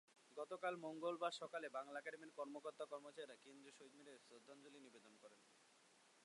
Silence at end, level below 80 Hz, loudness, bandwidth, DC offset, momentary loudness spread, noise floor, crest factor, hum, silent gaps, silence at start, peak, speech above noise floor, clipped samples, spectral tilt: 0 s; under -90 dBFS; -51 LUFS; 11.5 kHz; under 0.1%; 17 LU; -73 dBFS; 22 dB; none; none; 0.1 s; -30 dBFS; 21 dB; under 0.1%; -3.5 dB/octave